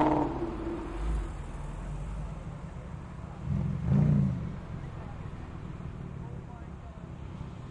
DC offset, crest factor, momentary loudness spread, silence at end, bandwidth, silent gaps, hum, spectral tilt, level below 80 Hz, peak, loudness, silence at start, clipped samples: under 0.1%; 18 dB; 16 LU; 0 s; 10 kHz; none; none; -9 dB/octave; -40 dBFS; -16 dBFS; -35 LUFS; 0 s; under 0.1%